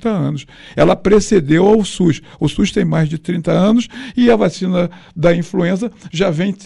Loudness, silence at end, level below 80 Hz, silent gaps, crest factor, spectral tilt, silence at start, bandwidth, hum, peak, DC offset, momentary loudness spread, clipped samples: -15 LUFS; 0 s; -36 dBFS; none; 12 dB; -6.5 dB/octave; 0 s; 11.5 kHz; none; -2 dBFS; under 0.1%; 9 LU; under 0.1%